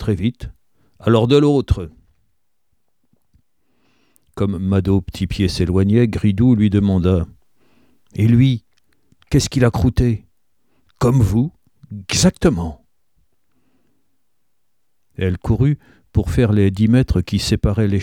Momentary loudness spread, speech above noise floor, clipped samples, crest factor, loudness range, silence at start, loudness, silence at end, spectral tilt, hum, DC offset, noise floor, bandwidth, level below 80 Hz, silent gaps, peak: 12 LU; 59 dB; under 0.1%; 18 dB; 8 LU; 0 s; -17 LUFS; 0 s; -6.5 dB/octave; none; 0.1%; -74 dBFS; 15.5 kHz; -32 dBFS; none; 0 dBFS